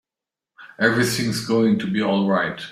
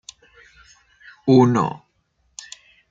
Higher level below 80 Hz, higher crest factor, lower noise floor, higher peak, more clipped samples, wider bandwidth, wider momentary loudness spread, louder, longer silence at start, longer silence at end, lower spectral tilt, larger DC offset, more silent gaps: about the same, -58 dBFS vs -62 dBFS; about the same, 18 dB vs 20 dB; first, -88 dBFS vs -66 dBFS; about the same, -2 dBFS vs -2 dBFS; neither; first, 16 kHz vs 7.8 kHz; second, 3 LU vs 27 LU; about the same, -20 LUFS vs -18 LUFS; second, 0.6 s vs 1.25 s; second, 0 s vs 1.15 s; second, -5 dB/octave vs -7 dB/octave; neither; neither